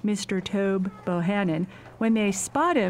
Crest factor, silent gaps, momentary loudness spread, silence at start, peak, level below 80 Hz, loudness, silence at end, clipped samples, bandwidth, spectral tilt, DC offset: 16 dB; none; 5 LU; 0.05 s; -10 dBFS; -58 dBFS; -26 LUFS; 0 s; under 0.1%; 15.5 kHz; -5 dB/octave; under 0.1%